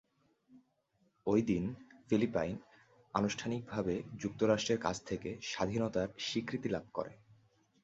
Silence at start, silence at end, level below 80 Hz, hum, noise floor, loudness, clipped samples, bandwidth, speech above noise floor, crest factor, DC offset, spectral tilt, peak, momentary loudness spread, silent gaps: 0.5 s; 0.7 s; -62 dBFS; none; -76 dBFS; -36 LUFS; under 0.1%; 8 kHz; 41 dB; 22 dB; under 0.1%; -5 dB/octave; -16 dBFS; 10 LU; none